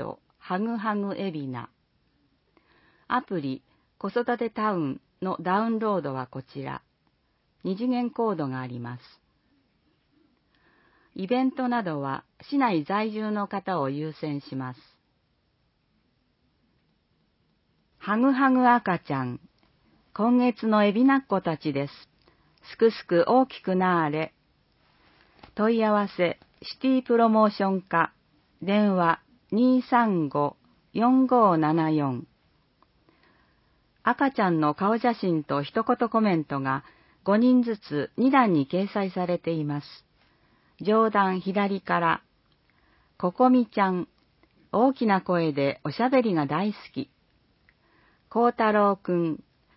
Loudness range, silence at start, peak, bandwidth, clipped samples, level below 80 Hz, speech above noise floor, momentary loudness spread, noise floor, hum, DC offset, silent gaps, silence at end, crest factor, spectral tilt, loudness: 8 LU; 0 s; -6 dBFS; 5.8 kHz; under 0.1%; -70 dBFS; 46 dB; 15 LU; -70 dBFS; none; under 0.1%; none; 0.4 s; 20 dB; -11 dB/octave; -25 LUFS